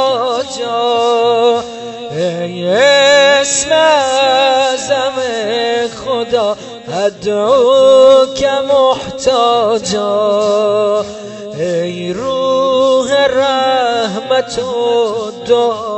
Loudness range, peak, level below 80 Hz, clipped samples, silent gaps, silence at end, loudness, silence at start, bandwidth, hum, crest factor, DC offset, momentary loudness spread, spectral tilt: 4 LU; 0 dBFS; -50 dBFS; under 0.1%; none; 0 s; -12 LUFS; 0 s; 8.6 kHz; none; 12 dB; under 0.1%; 10 LU; -3 dB/octave